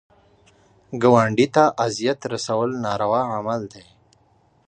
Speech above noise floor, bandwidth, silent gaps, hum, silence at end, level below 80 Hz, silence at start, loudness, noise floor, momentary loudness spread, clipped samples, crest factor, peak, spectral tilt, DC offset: 39 dB; 9.8 kHz; none; none; 0.9 s; -60 dBFS; 0.9 s; -20 LUFS; -60 dBFS; 11 LU; under 0.1%; 20 dB; -2 dBFS; -5.5 dB/octave; under 0.1%